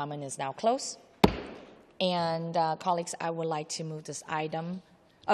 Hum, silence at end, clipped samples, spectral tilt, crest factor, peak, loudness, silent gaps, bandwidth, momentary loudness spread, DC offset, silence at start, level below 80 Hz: none; 0 s; under 0.1%; -4.5 dB/octave; 26 dB; -6 dBFS; -31 LUFS; none; 14 kHz; 13 LU; under 0.1%; 0 s; -52 dBFS